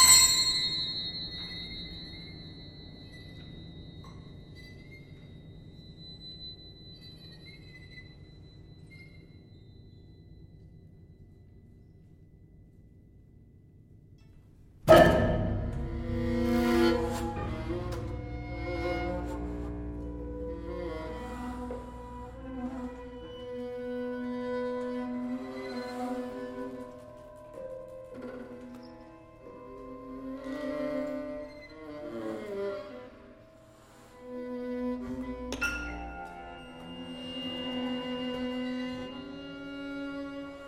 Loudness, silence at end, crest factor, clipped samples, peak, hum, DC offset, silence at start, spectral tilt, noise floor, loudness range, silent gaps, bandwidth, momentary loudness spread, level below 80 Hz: -31 LUFS; 0 s; 28 dB; under 0.1%; -6 dBFS; none; under 0.1%; 0 s; -3 dB/octave; -56 dBFS; 21 LU; none; 16.5 kHz; 21 LU; -46 dBFS